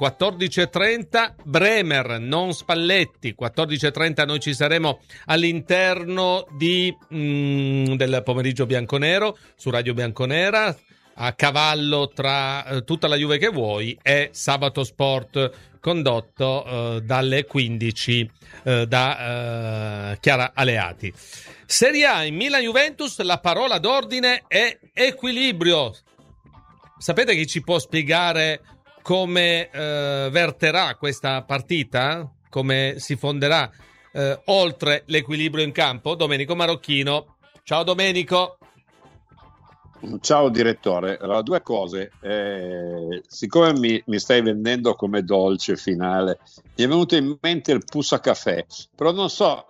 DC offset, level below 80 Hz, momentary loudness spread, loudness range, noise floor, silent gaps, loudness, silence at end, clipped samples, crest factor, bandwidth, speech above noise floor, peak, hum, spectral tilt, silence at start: under 0.1%; -58 dBFS; 9 LU; 3 LU; -54 dBFS; none; -21 LUFS; 0.1 s; under 0.1%; 20 dB; 15 kHz; 32 dB; -2 dBFS; none; -4.5 dB/octave; 0 s